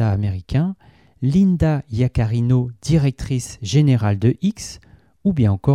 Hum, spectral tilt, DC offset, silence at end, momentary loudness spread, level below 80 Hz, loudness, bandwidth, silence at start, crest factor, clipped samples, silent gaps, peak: none; -7.5 dB/octave; under 0.1%; 0 s; 9 LU; -38 dBFS; -19 LUFS; 12 kHz; 0 s; 14 dB; under 0.1%; none; -6 dBFS